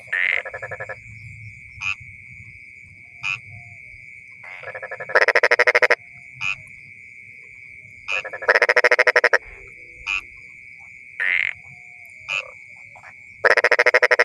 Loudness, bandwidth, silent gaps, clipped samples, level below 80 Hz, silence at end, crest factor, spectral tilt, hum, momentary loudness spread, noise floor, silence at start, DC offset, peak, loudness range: -19 LUFS; 15 kHz; none; under 0.1%; -58 dBFS; 0 s; 22 dB; -2 dB/octave; none; 25 LU; -44 dBFS; 0.05 s; under 0.1%; 0 dBFS; 12 LU